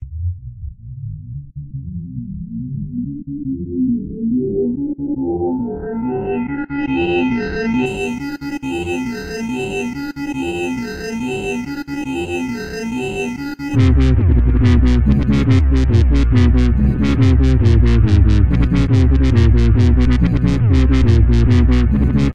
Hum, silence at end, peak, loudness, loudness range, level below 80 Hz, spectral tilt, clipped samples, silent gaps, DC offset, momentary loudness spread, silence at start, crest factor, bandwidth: none; 0 s; 0 dBFS; -16 LUFS; 9 LU; -18 dBFS; -8 dB/octave; under 0.1%; none; under 0.1%; 13 LU; 0 s; 14 dB; 8.8 kHz